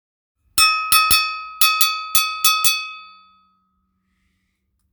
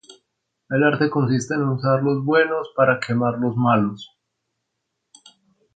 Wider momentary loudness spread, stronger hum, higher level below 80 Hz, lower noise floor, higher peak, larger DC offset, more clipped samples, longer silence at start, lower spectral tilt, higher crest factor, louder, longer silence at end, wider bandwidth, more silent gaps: first, 10 LU vs 4 LU; neither; first, -50 dBFS vs -62 dBFS; second, -69 dBFS vs -77 dBFS; first, 0 dBFS vs -4 dBFS; neither; neither; first, 0.55 s vs 0.1 s; second, 2.5 dB/octave vs -7 dB/octave; about the same, 20 dB vs 18 dB; first, -15 LUFS vs -20 LUFS; first, 1.85 s vs 1.7 s; first, over 20 kHz vs 9.2 kHz; neither